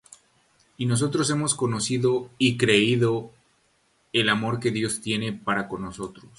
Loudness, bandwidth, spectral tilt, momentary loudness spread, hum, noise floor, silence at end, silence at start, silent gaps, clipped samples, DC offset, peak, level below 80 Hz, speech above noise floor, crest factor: -24 LUFS; 11.5 kHz; -4.5 dB/octave; 11 LU; none; -66 dBFS; 0.1 s; 0.8 s; none; under 0.1%; under 0.1%; -6 dBFS; -58 dBFS; 42 dB; 20 dB